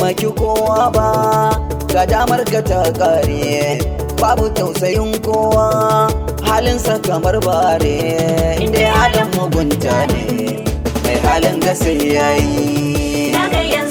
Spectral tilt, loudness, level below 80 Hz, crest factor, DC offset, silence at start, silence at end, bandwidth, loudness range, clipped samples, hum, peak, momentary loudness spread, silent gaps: -5 dB/octave; -15 LUFS; -26 dBFS; 14 dB; under 0.1%; 0 s; 0 s; over 20 kHz; 1 LU; under 0.1%; none; -2 dBFS; 4 LU; none